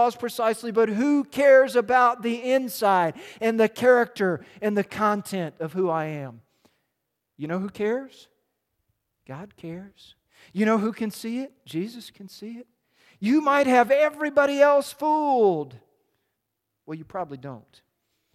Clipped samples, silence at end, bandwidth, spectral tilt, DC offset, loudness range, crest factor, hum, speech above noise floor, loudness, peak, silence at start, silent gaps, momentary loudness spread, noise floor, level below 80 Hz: under 0.1%; 0.75 s; 15 kHz; -5.5 dB/octave; under 0.1%; 13 LU; 20 dB; none; 57 dB; -23 LUFS; -4 dBFS; 0 s; none; 21 LU; -80 dBFS; -70 dBFS